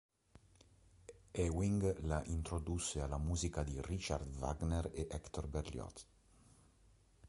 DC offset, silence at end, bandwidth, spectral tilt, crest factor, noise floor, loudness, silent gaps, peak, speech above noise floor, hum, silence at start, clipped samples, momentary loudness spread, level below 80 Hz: under 0.1%; 0 s; 11.5 kHz; -5.5 dB/octave; 20 dB; -69 dBFS; -41 LUFS; none; -22 dBFS; 29 dB; none; 1.1 s; under 0.1%; 12 LU; -48 dBFS